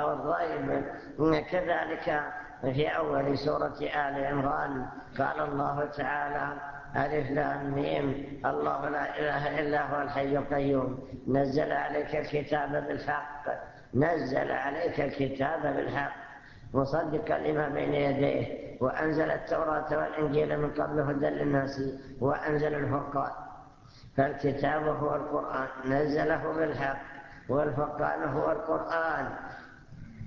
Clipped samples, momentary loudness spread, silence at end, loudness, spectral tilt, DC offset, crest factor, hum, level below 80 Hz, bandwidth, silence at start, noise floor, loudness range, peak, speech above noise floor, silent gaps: under 0.1%; 8 LU; 0 s; -30 LUFS; -8 dB/octave; under 0.1%; 20 dB; none; -54 dBFS; 7 kHz; 0 s; -52 dBFS; 2 LU; -10 dBFS; 22 dB; none